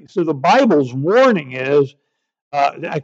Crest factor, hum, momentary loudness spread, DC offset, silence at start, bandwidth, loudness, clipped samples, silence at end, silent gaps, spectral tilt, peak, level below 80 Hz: 14 dB; none; 8 LU; under 0.1%; 0.15 s; 7.8 kHz; -16 LUFS; under 0.1%; 0 s; 2.42-2.51 s; -6.5 dB/octave; -4 dBFS; -74 dBFS